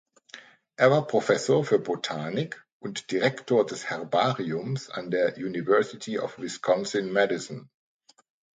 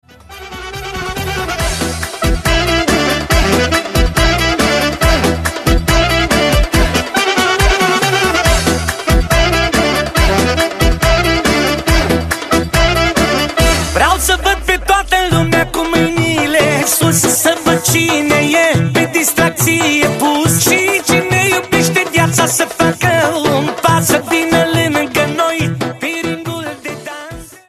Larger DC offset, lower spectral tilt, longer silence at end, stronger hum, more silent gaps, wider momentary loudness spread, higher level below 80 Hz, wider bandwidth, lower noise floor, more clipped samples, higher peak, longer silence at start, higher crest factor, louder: neither; first, -5 dB/octave vs -3.5 dB/octave; first, 0.9 s vs 0.15 s; neither; first, 2.72-2.80 s vs none; first, 14 LU vs 7 LU; second, -72 dBFS vs -22 dBFS; second, 9.4 kHz vs 14.5 kHz; first, -50 dBFS vs -33 dBFS; neither; second, -6 dBFS vs 0 dBFS; about the same, 0.35 s vs 0.3 s; first, 22 dB vs 12 dB; second, -26 LUFS vs -12 LUFS